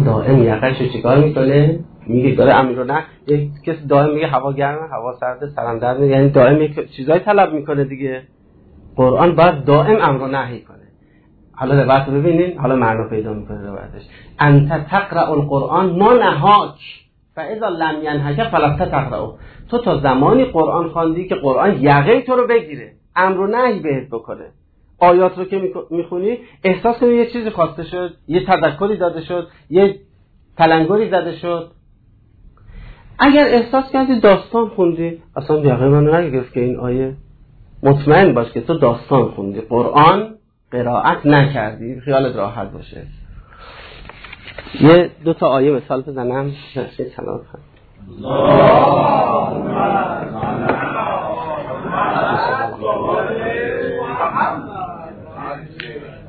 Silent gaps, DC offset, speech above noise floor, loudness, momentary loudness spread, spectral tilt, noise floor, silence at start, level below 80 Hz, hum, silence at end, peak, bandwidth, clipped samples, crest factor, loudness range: none; under 0.1%; 36 dB; -15 LUFS; 16 LU; -10.5 dB/octave; -51 dBFS; 0 s; -42 dBFS; none; 0 s; 0 dBFS; 4.7 kHz; under 0.1%; 16 dB; 5 LU